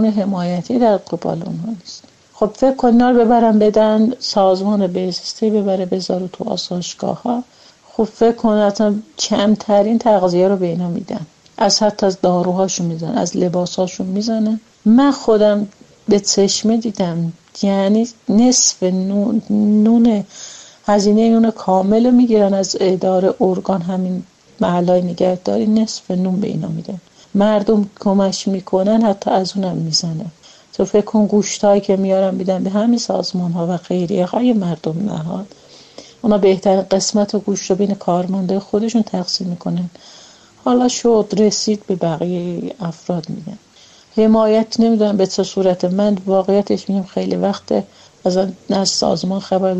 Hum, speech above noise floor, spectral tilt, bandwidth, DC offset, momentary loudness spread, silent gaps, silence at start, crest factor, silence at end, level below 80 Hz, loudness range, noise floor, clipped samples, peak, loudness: none; 31 dB; -5.5 dB/octave; 8.4 kHz; under 0.1%; 11 LU; none; 0 s; 14 dB; 0 s; -52 dBFS; 4 LU; -46 dBFS; under 0.1%; -2 dBFS; -16 LUFS